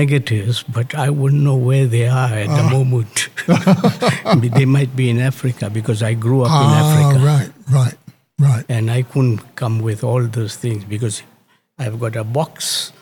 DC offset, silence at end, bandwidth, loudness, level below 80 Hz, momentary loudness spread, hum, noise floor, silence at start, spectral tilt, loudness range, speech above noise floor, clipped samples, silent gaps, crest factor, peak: under 0.1%; 0.15 s; 18 kHz; -16 LUFS; -58 dBFS; 10 LU; none; -46 dBFS; 0 s; -6 dB/octave; 6 LU; 30 dB; under 0.1%; none; 14 dB; 0 dBFS